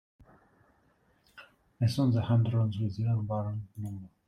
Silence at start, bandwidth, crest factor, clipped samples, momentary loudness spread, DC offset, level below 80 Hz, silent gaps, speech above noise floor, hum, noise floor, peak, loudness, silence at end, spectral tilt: 1.35 s; 11 kHz; 16 dB; under 0.1%; 13 LU; under 0.1%; -62 dBFS; none; 39 dB; none; -68 dBFS; -14 dBFS; -30 LUFS; 0.2 s; -8.5 dB/octave